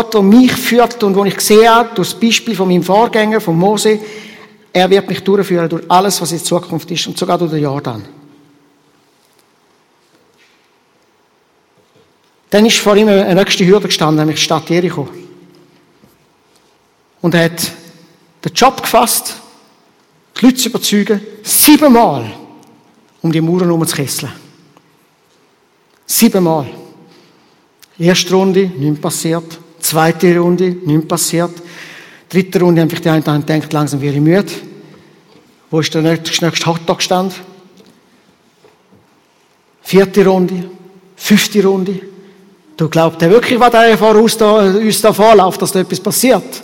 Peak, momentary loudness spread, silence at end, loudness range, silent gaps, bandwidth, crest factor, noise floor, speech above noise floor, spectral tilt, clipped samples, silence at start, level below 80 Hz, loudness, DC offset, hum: 0 dBFS; 12 LU; 0 s; 8 LU; none; 17 kHz; 12 dB; -54 dBFS; 43 dB; -4.5 dB/octave; 0.3%; 0 s; -52 dBFS; -11 LUFS; under 0.1%; none